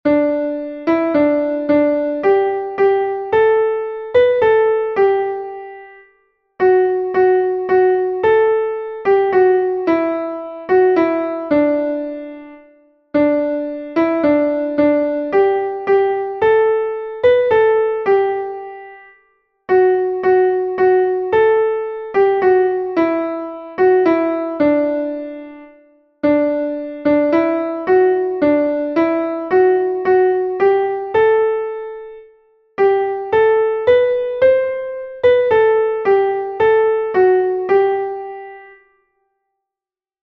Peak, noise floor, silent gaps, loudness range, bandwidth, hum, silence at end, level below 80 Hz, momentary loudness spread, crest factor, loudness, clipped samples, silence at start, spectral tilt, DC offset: -2 dBFS; -90 dBFS; none; 3 LU; 5.4 kHz; none; 1.55 s; -54 dBFS; 10 LU; 14 dB; -16 LUFS; under 0.1%; 0.05 s; -8 dB/octave; under 0.1%